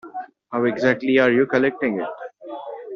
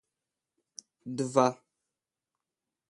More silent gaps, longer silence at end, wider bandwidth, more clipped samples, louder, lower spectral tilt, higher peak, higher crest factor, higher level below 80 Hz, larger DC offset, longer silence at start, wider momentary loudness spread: neither; second, 0 s vs 1.35 s; second, 7 kHz vs 11.5 kHz; neither; first, -20 LUFS vs -29 LUFS; about the same, -4.5 dB/octave vs -5.5 dB/octave; first, -4 dBFS vs -8 dBFS; second, 18 dB vs 26 dB; first, -64 dBFS vs -80 dBFS; neither; second, 0.05 s vs 1.05 s; second, 18 LU vs 23 LU